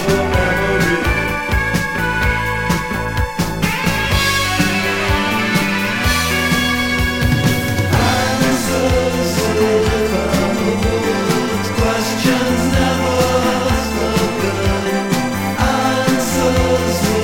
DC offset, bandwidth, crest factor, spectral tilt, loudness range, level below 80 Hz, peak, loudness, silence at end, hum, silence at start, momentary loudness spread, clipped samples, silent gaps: under 0.1%; 17 kHz; 14 dB; -4.5 dB/octave; 1 LU; -28 dBFS; -2 dBFS; -16 LUFS; 0 s; none; 0 s; 3 LU; under 0.1%; none